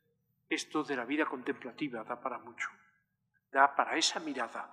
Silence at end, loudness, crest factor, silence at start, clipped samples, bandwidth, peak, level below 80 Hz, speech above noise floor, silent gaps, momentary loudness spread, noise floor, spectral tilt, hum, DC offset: 0 s; -34 LUFS; 26 dB; 0.5 s; under 0.1%; 12.5 kHz; -10 dBFS; under -90 dBFS; 45 dB; none; 12 LU; -79 dBFS; -2 dB/octave; 50 Hz at -70 dBFS; under 0.1%